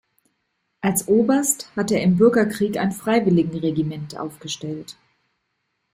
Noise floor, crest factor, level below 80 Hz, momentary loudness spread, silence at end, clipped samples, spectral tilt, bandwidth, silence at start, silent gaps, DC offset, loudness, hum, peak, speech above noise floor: -74 dBFS; 18 dB; -58 dBFS; 15 LU; 1 s; under 0.1%; -5.5 dB/octave; 16 kHz; 0.85 s; none; under 0.1%; -20 LUFS; none; -4 dBFS; 54 dB